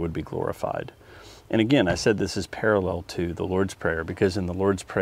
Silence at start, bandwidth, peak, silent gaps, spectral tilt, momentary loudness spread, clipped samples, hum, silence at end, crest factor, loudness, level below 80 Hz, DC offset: 0 s; 16 kHz; -6 dBFS; none; -5.5 dB/octave; 9 LU; under 0.1%; none; 0 s; 20 dB; -25 LUFS; -48 dBFS; under 0.1%